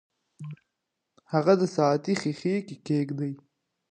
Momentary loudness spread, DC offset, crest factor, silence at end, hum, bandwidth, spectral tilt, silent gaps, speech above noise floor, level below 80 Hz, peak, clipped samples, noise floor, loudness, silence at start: 20 LU; under 0.1%; 20 dB; 0.55 s; none; 10 kHz; -7 dB/octave; none; 57 dB; -76 dBFS; -8 dBFS; under 0.1%; -82 dBFS; -27 LUFS; 0.4 s